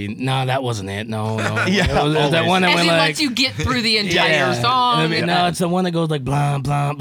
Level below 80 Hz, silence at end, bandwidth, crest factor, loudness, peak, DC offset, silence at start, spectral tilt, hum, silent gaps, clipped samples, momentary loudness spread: -42 dBFS; 0 s; 19 kHz; 16 dB; -17 LUFS; -2 dBFS; under 0.1%; 0 s; -5 dB/octave; none; none; under 0.1%; 7 LU